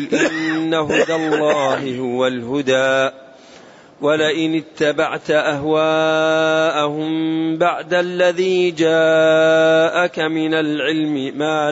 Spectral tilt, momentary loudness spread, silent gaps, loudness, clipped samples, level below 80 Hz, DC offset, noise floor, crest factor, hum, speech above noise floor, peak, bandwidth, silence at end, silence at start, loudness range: -5 dB/octave; 7 LU; none; -17 LUFS; under 0.1%; -62 dBFS; under 0.1%; -43 dBFS; 12 dB; none; 26 dB; -4 dBFS; 8 kHz; 0 s; 0 s; 4 LU